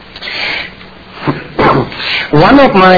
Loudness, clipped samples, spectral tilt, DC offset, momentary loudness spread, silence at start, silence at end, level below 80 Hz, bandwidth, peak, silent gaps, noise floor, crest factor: -10 LUFS; 1%; -7 dB/octave; under 0.1%; 15 LU; 0 s; 0 s; -34 dBFS; 5.4 kHz; 0 dBFS; none; -32 dBFS; 10 dB